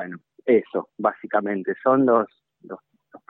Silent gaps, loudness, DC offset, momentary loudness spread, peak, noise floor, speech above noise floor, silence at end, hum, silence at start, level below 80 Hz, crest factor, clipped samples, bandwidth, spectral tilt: none; -22 LUFS; under 0.1%; 22 LU; -6 dBFS; -51 dBFS; 30 dB; 0.1 s; none; 0 s; -80 dBFS; 18 dB; under 0.1%; 4 kHz; -10.5 dB/octave